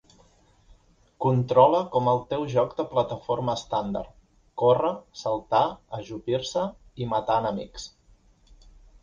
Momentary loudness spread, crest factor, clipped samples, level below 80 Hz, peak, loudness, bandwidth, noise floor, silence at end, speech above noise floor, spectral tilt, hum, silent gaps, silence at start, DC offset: 15 LU; 22 dB; under 0.1%; -54 dBFS; -4 dBFS; -25 LUFS; 7.6 kHz; -59 dBFS; 1.15 s; 34 dB; -6.5 dB/octave; none; none; 1.2 s; under 0.1%